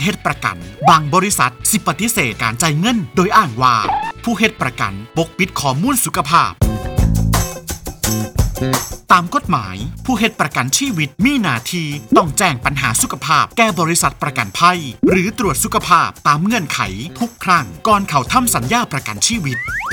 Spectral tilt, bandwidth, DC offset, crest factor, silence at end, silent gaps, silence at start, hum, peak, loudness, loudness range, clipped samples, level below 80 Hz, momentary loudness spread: -4 dB/octave; over 20 kHz; under 0.1%; 16 dB; 0 s; none; 0 s; none; 0 dBFS; -15 LUFS; 2 LU; under 0.1%; -30 dBFS; 8 LU